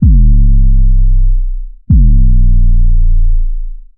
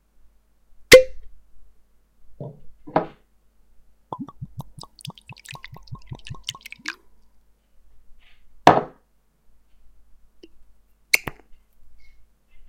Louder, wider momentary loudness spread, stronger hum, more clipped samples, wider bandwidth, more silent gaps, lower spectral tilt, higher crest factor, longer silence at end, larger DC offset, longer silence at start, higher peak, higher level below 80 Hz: first, -12 LUFS vs -18 LUFS; second, 12 LU vs 28 LU; neither; neither; second, 0.3 kHz vs 16.5 kHz; neither; first, -22 dB/octave vs -3 dB/octave; second, 6 dB vs 26 dB; about the same, 0.15 s vs 0.05 s; neither; second, 0 s vs 0.9 s; about the same, 0 dBFS vs 0 dBFS; first, -6 dBFS vs -48 dBFS